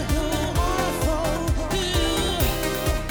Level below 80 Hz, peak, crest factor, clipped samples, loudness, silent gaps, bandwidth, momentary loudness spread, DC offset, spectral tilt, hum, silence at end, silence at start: -28 dBFS; -10 dBFS; 12 dB; under 0.1%; -24 LUFS; none; over 20 kHz; 2 LU; under 0.1%; -4.5 dB/octave; none; 0 s; 0 s